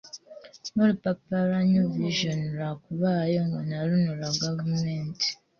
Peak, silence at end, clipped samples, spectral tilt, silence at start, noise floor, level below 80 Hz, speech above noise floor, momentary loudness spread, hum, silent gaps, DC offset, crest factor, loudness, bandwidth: -12 dBFS; 0.25 s; under 0.1%; -6 dB/octave; 0.05 s; -48 dBFS; -62 dBFS; 22 dB; 9 LU; none; none; under 0.1%; 16 dB; -27 LUFS; 7.2 kHz